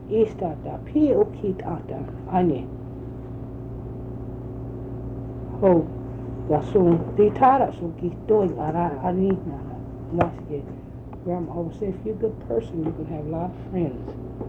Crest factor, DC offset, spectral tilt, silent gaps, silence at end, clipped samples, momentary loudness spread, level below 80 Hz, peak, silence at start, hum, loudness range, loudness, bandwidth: 18 dB; under 0.1%; -10.5 dB/octave; none; 0 s; under 0.1%; 16 LU; -42 dBFS; -6 dBFS; 0 s; none; 8 LU; -25 LUFS; 6.8 kHz